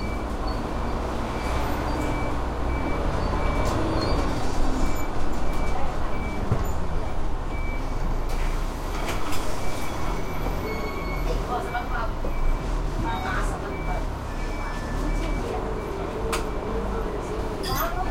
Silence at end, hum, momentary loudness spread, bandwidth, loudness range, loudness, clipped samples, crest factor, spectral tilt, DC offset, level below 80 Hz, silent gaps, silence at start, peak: 0 s; none; 5 LU; 16 kHz; 3 LU; -29 LUFS; under 0.1%; 14 dB; -5.5 dB/octave; under 0.1%; -28 dBFS; none; 0 s; -10 dBFS